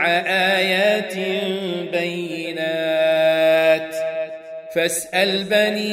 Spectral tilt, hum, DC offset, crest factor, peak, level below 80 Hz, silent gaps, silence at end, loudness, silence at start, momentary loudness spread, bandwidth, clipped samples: -3.5 dB/octave; none; under 0.1%; 16 dB; -4 dBFS; -68 dBFS; none; 0 s; -19 LUFS; 0 s; 10 LU; 16 kHz; under 0.1%